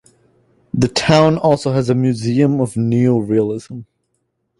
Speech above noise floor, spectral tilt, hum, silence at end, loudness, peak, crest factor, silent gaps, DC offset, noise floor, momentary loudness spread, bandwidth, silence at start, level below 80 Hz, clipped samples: 54 dB; -6.5 dB/octave; none; 0.75 s; -15 LUFS; 0 dBFS; 16 dB; none; under 0.1%; -69 dBFS; 13 LU; 11.5 kHz; 0.75 s; -48 dBFS; under 0.1%